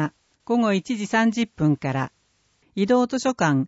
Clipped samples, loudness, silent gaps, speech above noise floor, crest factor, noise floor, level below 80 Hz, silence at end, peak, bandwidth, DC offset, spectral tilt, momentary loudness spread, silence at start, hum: under 0.1%; -23 LUFS; none; 44 dB; 16 dB; -66 dBFS; -60 dBFS; 0 s; -8 dBFS; 8 kHz; under 0.1%; -6 dB/octave; 9 LU; 0 s; none